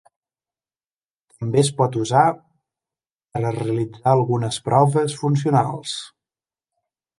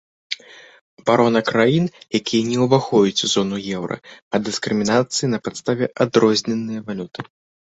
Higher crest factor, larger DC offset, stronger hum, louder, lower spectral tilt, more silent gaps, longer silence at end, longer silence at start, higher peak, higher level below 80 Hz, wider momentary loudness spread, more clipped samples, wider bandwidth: about the same, 20 dB vs 18 dB; neither; neither; about the same, -20 LUFS vs -19 LUFS; about the same, -6 dB/octave vs -5 dB/octave; second, 3.12-3.16 s vs 0.81-0.97 s, 4.22-4.31 s; first, 1.1 s vs 0.5 s; first, 1.4 s vs 0.3 s; about the same, -2 dBFS vs -2 dBFS; about the same, -60 dBFS vs -58 dBFS; about the same, 13 LU vs 14 LU; neither; first, 11.5 kHz vs 8.2 kHz